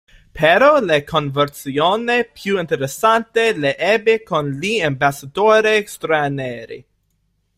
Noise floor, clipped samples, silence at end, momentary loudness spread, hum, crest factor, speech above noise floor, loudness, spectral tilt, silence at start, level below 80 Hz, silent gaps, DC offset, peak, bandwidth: -66 dBFS; under 0.1%; 0.75 s; 9 LU; none; 16 dB; 49 dB; -17 LUFS; -4.5 dB/octave; 0.35 s; -52 dBFS; none; under 0.1%; -2 dBFS; 16 kHz